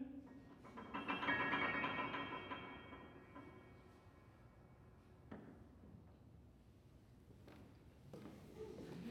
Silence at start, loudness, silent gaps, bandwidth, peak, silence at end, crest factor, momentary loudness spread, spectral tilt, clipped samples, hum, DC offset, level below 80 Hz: 0 s; -45 LUFS; none; 15.5 kHz; -28 dBFS; 0 s; 22 dB; 26 LU; -5.5 dB/octave; under 0.1%; none; under 0.1%; -70 dBFS